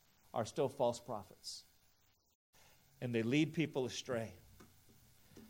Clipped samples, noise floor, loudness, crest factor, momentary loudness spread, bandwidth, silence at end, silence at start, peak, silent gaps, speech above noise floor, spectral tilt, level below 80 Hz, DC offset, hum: under 0.1%; -73 dBFS; -40 LUFS; 20 dB; 14 LU; 16 kHz; 0 s; 0.35 s; -22 dBFS; 2.35-2.53 s; 35 dB; -5.5 dB/octave; -76 dBFS; under 0.1%; none